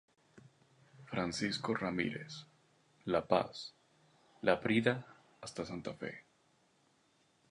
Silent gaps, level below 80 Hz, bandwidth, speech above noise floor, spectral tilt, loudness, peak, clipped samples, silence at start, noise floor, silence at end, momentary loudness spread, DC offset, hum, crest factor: none; -68 dBFS; 11 kHz; 37 dB; -5 dB/octave; -37 LUFS; -14 dBFS; under 0.1%; 0.35 s; -73 dBFS; 1.3 s; 17 LU; under 0.1%; none; 26 dB